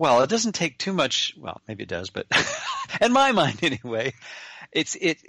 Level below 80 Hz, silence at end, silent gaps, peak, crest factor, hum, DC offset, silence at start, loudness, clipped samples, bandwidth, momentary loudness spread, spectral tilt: -60 dBFS; 0.15 s; none; -6 dBFS; 18 dB; none; under 0.1%; 0 s; -23 LUFS; under 0.1%; 11.5 kHz; 17 LU; -3.5 dB/octave